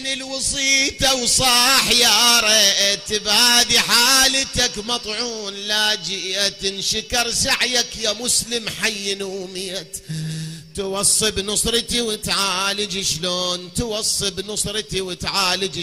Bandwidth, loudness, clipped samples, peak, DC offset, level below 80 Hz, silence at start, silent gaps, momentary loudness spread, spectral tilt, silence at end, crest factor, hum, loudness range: 15.5 kHz; -17 LUFS; under 0.1%; 0 dBFS; 0.1%; -42 dBFS; 0 s; none; 14 LU; -1 dB/octave; 0 s; 20 dB; none; 8 LU